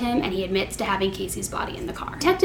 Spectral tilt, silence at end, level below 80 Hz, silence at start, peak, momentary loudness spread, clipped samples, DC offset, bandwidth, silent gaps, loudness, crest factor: -4 dB/octave; 0 s; -42 dBFS; 0 s; -6 dBFS; 6 LU; under 0.1%; under 0.1%; 18 kHz; none; -26 LUFS; 18 dB